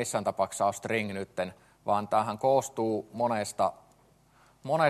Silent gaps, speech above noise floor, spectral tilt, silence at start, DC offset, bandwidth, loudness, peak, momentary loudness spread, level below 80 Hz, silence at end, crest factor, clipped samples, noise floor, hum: none; 33 dB; -4.5 dB/octave; 0 s; under 0.1%; 13 kHz; -30 LUFS; -10 dBFS; 9 LU; -70 dBFS; 0 s; 20 dB; under 0.1%; -62 dBFS; none